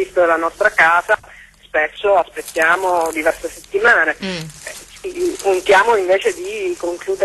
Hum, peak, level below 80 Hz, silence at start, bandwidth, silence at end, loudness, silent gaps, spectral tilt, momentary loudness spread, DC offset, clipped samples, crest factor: none; 0 dBFS; -50 dBFS; 0 s; 13 kHz; 0 s; -16 LUFS; none; -3 dB/octave; 14 LU; under 0.1%; under 0.1%; 16 dB